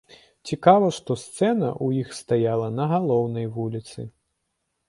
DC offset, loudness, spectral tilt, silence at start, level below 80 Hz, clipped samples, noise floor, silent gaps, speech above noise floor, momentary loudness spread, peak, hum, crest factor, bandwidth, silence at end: under 0.1%; -23 LUFS; -7 dB/octave; 0.45 s; -62 dBFS; under 0.1%; -77 dBFS; none; 54 dB; 17 LU; -2 dBFS; none; 22 dB; 11.5 kHz; 0.8 s